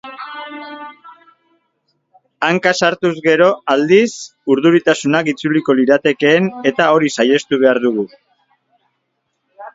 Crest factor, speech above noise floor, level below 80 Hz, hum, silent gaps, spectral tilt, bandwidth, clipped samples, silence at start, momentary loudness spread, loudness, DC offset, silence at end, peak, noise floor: 16 dB; 56 dB; -62 dBFS; none; none; -5 dB/octave; 7.8 kHz; under 0.1%; 0.05 s; 17 LU; -14 LUFS; under 0.1%; 0.05 s; 0 dBFS; -70 dBFS